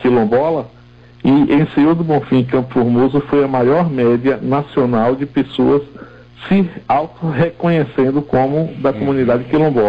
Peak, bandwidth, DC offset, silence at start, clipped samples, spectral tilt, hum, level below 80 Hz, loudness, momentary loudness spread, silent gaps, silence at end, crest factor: -6 dBFS; 5.2 kHz; under 0.1%; 0 s; under 0.1%; -10 dB/octave; none; -44 dBFS; -15 LUFS; 5 LU; none; 0 s; 8 dB